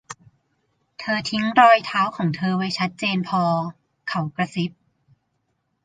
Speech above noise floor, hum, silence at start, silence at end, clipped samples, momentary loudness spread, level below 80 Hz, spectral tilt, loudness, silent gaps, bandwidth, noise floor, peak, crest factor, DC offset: 52 dB; none; 0.1 s; 1.15 s; under 0.1%; 18 LU; -66 dBFS; -5.5 dB/octave; -21 LUFS; none; 9.4 kHz; -72 dBFS; -2 dBFS; 20 dB; under 0.1%